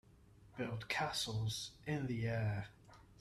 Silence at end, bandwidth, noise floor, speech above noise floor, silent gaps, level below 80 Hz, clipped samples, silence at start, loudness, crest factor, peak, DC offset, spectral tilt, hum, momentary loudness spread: 0.05 s; 14.5 kHz; -64 dBFS; 24 dB; none; -64 dBFS; under 0.1%; 0.4 s; -40 LUFS; 16 dB; -24 dBFS; under 0.1%; -4.5 dB/octave; none; 8 LU